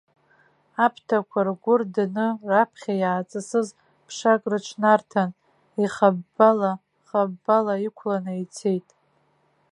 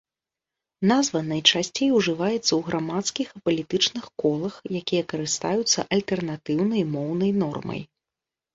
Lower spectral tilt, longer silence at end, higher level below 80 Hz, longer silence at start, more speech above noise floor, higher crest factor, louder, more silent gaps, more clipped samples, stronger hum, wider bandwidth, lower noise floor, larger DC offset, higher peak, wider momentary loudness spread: first, -6 dB/octave vs -4 dB/octave; first, 0.9 s vs 0.7 s; second, -76 dBFS vs -62 dBFS; about the same, 0.8 s vs 0.8 s; second, 43 dB vs 65 dB; about the same, 20 dB vs 24 dB; about the same, -23 LUFS vs -24 LUFS; neither; neither; neither; first, 11 kHz vs 8 kHz; second, -65 dBFS vs -89 dBFS; neither; about the same, -2 dBFS vs -2 dBFS; about the same, 9 LU vs 8 LU